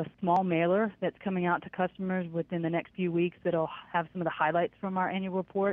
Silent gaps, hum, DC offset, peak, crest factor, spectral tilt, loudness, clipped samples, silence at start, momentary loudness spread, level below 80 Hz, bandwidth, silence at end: none; none; under 0.1%; -12 dBFS; 18 dB; -9.5 dB/octave; -31 LUFS; under 0.1%; 0 s; 6 LU; -68 dBFS; 4 kHz; 0 s